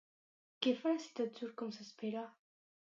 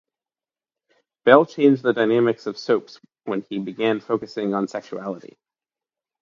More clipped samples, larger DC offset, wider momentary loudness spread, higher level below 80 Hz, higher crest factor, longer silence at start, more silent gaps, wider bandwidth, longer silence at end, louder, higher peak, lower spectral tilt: neither; neither; second, 10 LU vs 16 LU; second, under -90 dBFS vs -70 dBFS; about the same, 22 dB vs 22 dB; second, 0.6 s vs 1.25 s; neither; about the same, 7.6 kHz vs 7.4 kHz; second, 0.6 s vs 1.05 s; second, -40 LUFS vs -21 LUFS; second, -20 dBFS vs 0 dBFS; second, -4.5 dB/octave vs -6.5 dB/octave